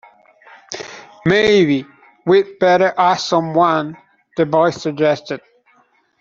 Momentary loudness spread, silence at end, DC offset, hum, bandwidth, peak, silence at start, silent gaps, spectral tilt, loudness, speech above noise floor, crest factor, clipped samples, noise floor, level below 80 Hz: 17 LU; 0.8 s; under 0.1%; none; 7.6 kHz; -2 dBFS; 0.7 s; none; -5.5 dB/octave; -16 LUFS; 42 dB; 14 dB; under 0.1%; -57 dBFS; -56 dBFS